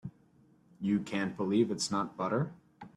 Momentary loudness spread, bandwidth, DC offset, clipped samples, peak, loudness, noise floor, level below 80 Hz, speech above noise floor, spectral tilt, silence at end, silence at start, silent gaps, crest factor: 10 LU; 12 kHz; under 0.1%; under 0.1%; -16 dBFS; -33 LUFS; -64 dBFS; -72 dBFS; 33 dB; -5.5 dB/octave; 0.1 s; 0.05 s; none; 18 dB